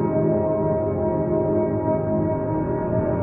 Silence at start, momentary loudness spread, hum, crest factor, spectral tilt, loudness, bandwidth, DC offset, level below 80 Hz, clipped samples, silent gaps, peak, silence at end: 0 s; 3 LU; none; 12 dB; -14 dB/octave; -22 LUFS; 2.9 kHz; under 0.1%; -42 dBFS; under 0.1%; none; -8 dBFS; 0 s